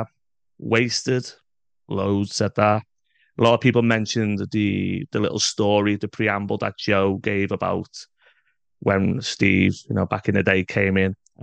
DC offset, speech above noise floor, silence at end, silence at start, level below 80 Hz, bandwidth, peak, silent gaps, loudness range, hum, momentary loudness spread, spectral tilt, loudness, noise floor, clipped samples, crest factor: under 0.1%; 56 dB; 0.3 s; 0 s; -58 dBFS; 9.4 kHz; 0 dBFS; none; 3 LU; none; 8 LU; -5 dB/octave; -21 LUFS; -77 dBFS; under 0.1%; 22 dB